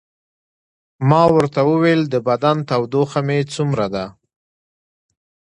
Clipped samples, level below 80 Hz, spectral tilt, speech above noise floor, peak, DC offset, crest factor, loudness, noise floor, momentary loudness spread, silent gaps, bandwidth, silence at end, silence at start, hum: under 0.1%; -54 dBFS; -7 dB/octave; over 74 dB; 0 dBFS; under 0.1%; 18 dB; -17 LUFS; under -90 dBFS; 8 LU; none; 11 kHz; 1.5 s; 1 s; none